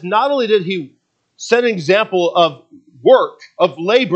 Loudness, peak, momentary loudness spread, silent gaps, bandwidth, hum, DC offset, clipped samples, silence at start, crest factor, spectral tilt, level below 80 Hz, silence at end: -15 LUFS; 0 dBFS; 11 LU; none; 8.4 kHz; none; under 0.1%; under 0.1%; 0 s; 16 dB; -5 dB/octave; -70 dBFS; 0 s